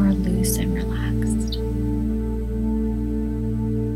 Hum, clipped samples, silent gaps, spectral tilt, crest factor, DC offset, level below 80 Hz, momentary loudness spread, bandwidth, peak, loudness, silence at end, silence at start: none; under 0.1%; none; -6.5 dB/octave; 14 dB; under 0.1%; -28 dBFS; 4 LU; 15.5 kHz; -8 dBFS; -24 LUFS; 0 s; 0 s